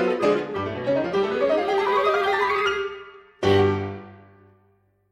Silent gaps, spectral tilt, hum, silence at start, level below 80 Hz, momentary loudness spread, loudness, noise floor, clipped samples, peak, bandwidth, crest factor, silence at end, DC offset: none; -6 dB/octave; none; 0 s; -58 dBFS; 9 LU; -22 LUFS; -63 dBFS; under 0.1%; -6 dBFS; 10.5 kHz; 16 dB; 0.95 s; under 0.1%